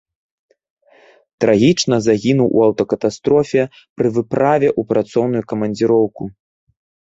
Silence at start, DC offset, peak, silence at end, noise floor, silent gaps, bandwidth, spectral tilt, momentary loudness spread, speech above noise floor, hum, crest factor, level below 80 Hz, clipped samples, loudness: 1.4 s; under 0.1%; -2 dBFS; 0.8 s; -50 dBFS; 3.90-3.96 s; 8 kHz; -6 dB/octave; 7 LU; 35 dB; none; 16 dB; -54 dBFS; under 0.1%; -16 LUFS